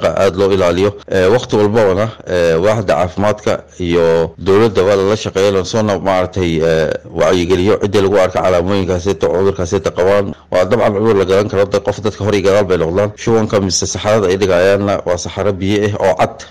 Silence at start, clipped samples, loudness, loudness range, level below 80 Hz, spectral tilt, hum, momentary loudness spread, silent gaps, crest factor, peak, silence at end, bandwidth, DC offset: 0 s; under 0.1%; -13 LUFS; 1 LU; -38 dBFS; -5.5 dB/octave; none; 5 LU; none; 10 dB; -4 dBFS; 0 s; 14 kHz; 1%